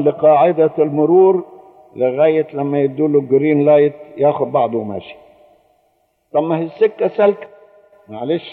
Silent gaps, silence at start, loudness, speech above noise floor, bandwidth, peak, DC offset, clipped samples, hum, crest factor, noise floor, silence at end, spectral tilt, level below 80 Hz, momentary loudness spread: none; 0 s; -15 LUFS; 48 dB; 4.3 kHz; -2 dBFS; under 0.1%; under 0.1%; none; 14 dB; -62 dBFS; 0 s; -10.5 dB/octave; -68 dBFS; 10 LU